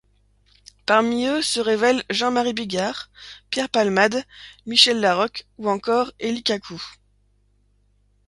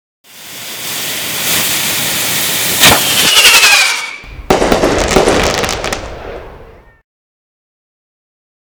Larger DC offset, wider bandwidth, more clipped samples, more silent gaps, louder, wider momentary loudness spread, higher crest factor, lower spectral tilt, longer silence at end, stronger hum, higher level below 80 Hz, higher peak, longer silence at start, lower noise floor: neither; second, 11.5 kHz vs over 20 kHz; second, under 0.1% vs 1%; neither; second, -20 LUFS vs -9 LUFS; about the same, 19 LU vs 21 LU; first, 22 dB vs 14 dB; first, -3 dB/octave vs -1.5 dB/octave; second, 1.35 s vs 2 s; first, 50 Hz at -50 dBFS vs none; second, -60 dBFS vs -32 dBFS; about the same, 0 dBFS vs 0 dBFS; first, 0.9 s vs 0.35 s; first, -62 dBFS vs -37 dBFS